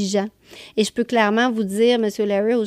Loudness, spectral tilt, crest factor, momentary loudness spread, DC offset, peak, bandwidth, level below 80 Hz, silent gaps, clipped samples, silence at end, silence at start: -20 LUFS; -4.5 dB/octave; 14 dB; 6 LU; under 0.1%; -4 dBFS; 14.5 kHz; -62 dBFS; none; under 0.1%; 0 s; 0 s